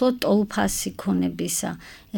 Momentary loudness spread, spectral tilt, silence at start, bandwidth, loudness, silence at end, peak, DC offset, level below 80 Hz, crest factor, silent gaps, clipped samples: 7 LU; -4.5 dB/octave; 0 s; 19.5 kHz; -24 LUFS; 0 s; -10 dBFS; under 0.1%; -48 dBFS; 14 dB; none; under 0.1%